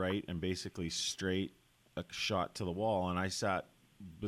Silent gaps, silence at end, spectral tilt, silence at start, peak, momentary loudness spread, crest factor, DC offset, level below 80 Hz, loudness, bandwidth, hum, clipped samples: none; 0 s; -4 dB/octave; 0 s; -20 dBFS; 11 LU; 16 dB; under 0.1%; -62 dBFS; -37 LUFS; 16 kHz; none; under 0.1%